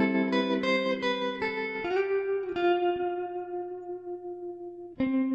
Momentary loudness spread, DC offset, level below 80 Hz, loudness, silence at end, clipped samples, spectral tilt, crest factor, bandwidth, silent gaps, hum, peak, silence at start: 13 LU; under 0.1%; -66 dBFS; -30 LUFS; 0 s; under 0.1%; -6 dB/octave; 16 dB; 7.8 kHz; none; none; -12 dBFS; 0 s